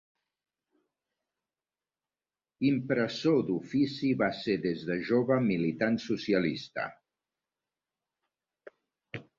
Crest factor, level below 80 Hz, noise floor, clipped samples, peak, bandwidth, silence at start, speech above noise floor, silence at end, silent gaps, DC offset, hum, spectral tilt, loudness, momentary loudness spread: 18 dB; -68 dBFS; under -90 dBFS; under 0.1%; -14 dBFS; 7.4 kHz; 2.6 s; over 61 dB; 0.15 s; none; under 0.1%; none; -7 dB/octave; -30 LUFS; 9 LU